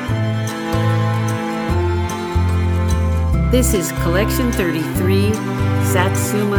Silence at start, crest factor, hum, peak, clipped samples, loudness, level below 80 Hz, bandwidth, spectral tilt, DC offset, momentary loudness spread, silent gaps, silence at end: 0 s; 16 dB; none; 0 dBFS; under 0.1%; -18 LUFS; -26 dBFS; over 20 kHz; -6 dB/octave; under 0.1%; 5 LU; none; 0 s